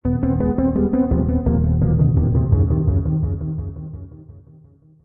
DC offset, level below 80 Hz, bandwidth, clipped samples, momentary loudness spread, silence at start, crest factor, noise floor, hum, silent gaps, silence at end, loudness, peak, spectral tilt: under 0.1%; -28 dBFS; 2.3 kHz; under 0.1%; 14 LU; 0.05 s; 14 dB; -49 dBFS; none; none; 0.65 s; -19 LUFS; -4 dBFS; -15 dB/octave